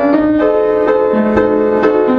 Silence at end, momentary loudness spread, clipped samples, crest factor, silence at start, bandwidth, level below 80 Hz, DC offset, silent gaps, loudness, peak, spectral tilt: 0 s; 1 LU; under 0.1%; 12 dB; 0 s; 5.8 kHz; -38 dBFS; under 0.1%; none; -12 LUFS; 0 dBFS; -8.5 dB/octave